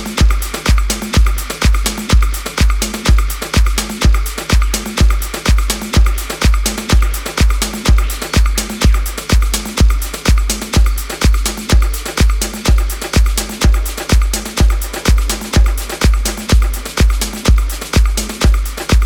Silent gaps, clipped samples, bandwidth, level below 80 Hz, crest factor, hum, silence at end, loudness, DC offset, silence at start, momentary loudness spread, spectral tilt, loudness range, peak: none; under 0.1%; 18 kHz; -14 dBFS; 12 dB; none; 0 s; -15 LUFS; under 0.1%; 0 s; 3 LU; -4 dB/octave; 0 LU; 0 dBFS